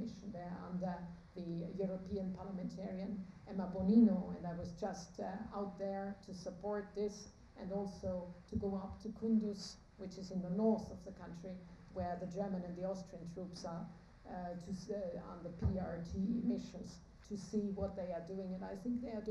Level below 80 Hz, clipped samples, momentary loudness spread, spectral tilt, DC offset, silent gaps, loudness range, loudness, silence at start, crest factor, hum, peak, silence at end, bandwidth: -60 dBFS; under 0.1%; 14 LU; -7.5 dB/octave; under 0.1%; none; 7 LU; -42 LUFS; 0 s; 22 dB; none; -20 dBFS; 0 s; 10 kHz